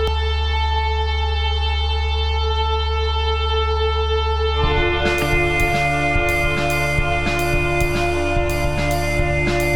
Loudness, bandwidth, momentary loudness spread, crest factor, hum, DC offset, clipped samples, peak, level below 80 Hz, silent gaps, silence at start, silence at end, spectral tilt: -19 LUFS; 17 kHz; 3 LU; 14 dB; none; 3%; under 0.1%; -4 dBFS; -22 dBFS; none; 0 s; 0 s; -5 dB/octave